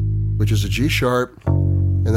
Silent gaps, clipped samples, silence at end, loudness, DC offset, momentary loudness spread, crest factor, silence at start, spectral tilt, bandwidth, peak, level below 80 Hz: none; under 0.1%; 0 s; -19 LUFS; under 0.1%; 3 LU; 12 dB; 0 s; -6.5 dB/octave; 15.5 kHz; -6 dBFS; -30 dBFS